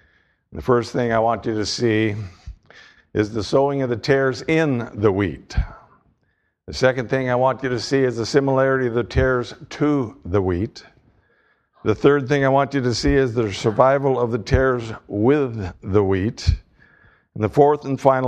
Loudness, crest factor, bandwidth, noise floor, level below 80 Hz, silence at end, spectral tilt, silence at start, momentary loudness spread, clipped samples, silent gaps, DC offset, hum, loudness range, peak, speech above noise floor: -20 LUFS; 20 dB; 9.6 kHz; -68 dBFS; -36 dBFS; 0 s; -6.5 dB/octave; 0.5 s; 10 LU; under 0.1%; none; under 0.1%; none; 4 LU; 0 dBFS; 49 dB